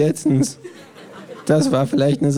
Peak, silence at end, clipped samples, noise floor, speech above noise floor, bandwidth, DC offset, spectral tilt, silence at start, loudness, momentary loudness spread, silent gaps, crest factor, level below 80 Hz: -4 dBFS; 0 s; under 0.1%; -38 dBFS; 21 dB; 15 kHz; under 0.1%; -6.5 dB/octave; 0 s; -18 LUFS; 22 LU; none; 14 dB; -58 dBFS